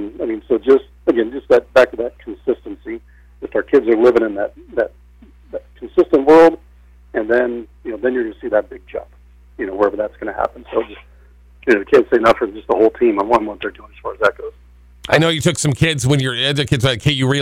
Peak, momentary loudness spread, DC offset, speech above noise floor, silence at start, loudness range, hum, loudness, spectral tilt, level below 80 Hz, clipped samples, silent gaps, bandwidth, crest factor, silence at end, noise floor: -2 dBFS; 17 LU; under 0.1%; 29 dB; 0 s; 6 LU; 60 Hz at -50 dBFS; -16 LUFS; -5.5 dB/octave; -44 dBFS; under 0.1%; none; 15.5 kHz; 14 dB; 0 s; -45 dBFS